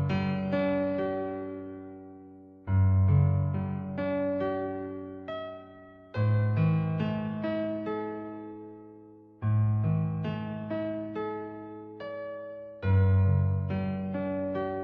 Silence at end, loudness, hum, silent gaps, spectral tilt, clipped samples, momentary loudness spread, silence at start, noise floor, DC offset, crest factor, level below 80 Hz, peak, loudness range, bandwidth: 0 s; -30 LUFS; none; none; -8.5 dB/octave; under 0.1%; 18 LU; 0 s; -52 dBFS; under 0.1%; 16 dB; -56 dBFS; -14 dBFS; 3 LU; 4.9 kHz